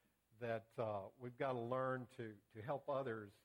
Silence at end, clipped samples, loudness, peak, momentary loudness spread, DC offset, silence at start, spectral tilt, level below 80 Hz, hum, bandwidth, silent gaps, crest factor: 0.15 s; under 0.1%; -46 LUFS; -28 dBFS; 11 LU; under 0.1%; 0.4 s; -8 dB/octave; -84 dBFS; none; 16.5 kHz; none; 18 dB